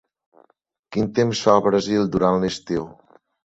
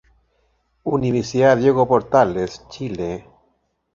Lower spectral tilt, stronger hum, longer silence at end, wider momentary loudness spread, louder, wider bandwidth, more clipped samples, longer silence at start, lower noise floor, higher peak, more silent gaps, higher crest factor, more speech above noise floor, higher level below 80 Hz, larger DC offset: about the same, -6 dB/octave vs -6.5 dB/octave; neither; about the same, 0.65 s vs 0.75 s; second, 10 LU vs 15 LU; about the same, -20 LUFS vs -19 LUFS; about the same, 8.2 kHz vs 7.6 kHz; neither; about the same, 0.9 s vs 0.85 s; about the same, -64 dBFS vs -67 dBFS; about the same, -2 dBFS vs -2 dBFS; neither; about the same, 20 dB vs 18 dB; second, 44 dB vs 49 dB; about the same, -52 dBFS vs -50 dBFS; neither